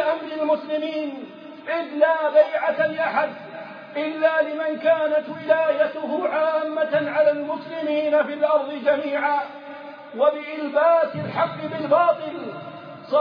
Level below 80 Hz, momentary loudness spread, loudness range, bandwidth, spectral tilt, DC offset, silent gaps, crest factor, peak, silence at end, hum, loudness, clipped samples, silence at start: -82 dBFS; 16 LU; 1 LU; 5.2 kHz; -7.5 dB/octave; under 0.1%; none; 18 dB; -4 dBFS; 0 s; none; -22 LUFS; under 0.1%; 0 s